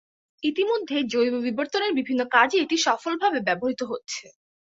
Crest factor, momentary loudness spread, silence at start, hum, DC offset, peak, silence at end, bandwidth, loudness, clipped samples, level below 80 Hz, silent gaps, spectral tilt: 20 dB; 11 LU; 0.4 s; none; under 0.1%; -4 dBFS; 0.4 s; 8 kHz; -24 LUFS; under 0.1%; -70 dBFS; none; -3 dB/octave